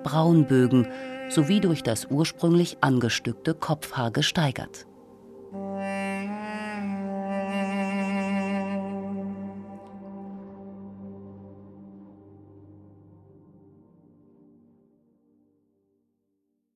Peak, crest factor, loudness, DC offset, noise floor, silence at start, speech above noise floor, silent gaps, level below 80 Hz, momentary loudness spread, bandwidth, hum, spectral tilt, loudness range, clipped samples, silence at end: -6 dBFS; 22 dB; -26 LUFS; under 0.1%; -76 dBFS; 0 s; 53 dB; none; -62 dBFS; 21 LU; 14.5 kHz; none; -6 dB/octave; 21 LU; under 0.1%; 3.95 s